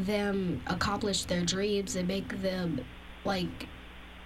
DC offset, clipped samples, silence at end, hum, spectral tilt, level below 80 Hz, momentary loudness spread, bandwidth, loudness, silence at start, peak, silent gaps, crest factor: under 0.1%; under 0.1%; 0 s; none; -4.5 dB/octave; -50 dBFS; 15 LU; 15.5 kHz; -32 LUFS; 0 s; -16 dBFS; none; 16 dB